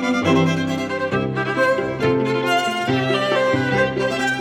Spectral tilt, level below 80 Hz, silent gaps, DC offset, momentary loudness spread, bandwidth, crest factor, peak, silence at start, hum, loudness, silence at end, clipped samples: -5.5 dB/octave; -50 dBFS; none; under 0.1%; 4 LU; 15.5 kHz; 14 dB; -4 dBFS; 0 s; none; -19 LUFS; 0 s; under 0.1%